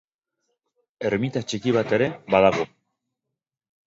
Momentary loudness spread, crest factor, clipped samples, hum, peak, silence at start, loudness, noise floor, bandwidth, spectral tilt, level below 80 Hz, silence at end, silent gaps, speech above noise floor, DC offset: 10 LU; 22 dB; under 0.1%; none; -2 dBFS; 1 s; -23 LUFS; -85 dBFS; 7.8 kHz; -6 dB/octave; -58 dBFS; 1.2 s; none; 63 dB; under 0.1%